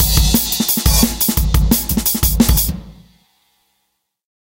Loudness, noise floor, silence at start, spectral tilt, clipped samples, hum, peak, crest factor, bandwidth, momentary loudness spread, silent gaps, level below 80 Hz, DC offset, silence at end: -14 LUFS; -69 dBFS; 0 s; -3.5 dB/octave; under 0.1%; none; 0 dBFS; 16 dB; 17.5 kHz; 3 LU; none; -20 dBFS; under 0.1%; 1.65 s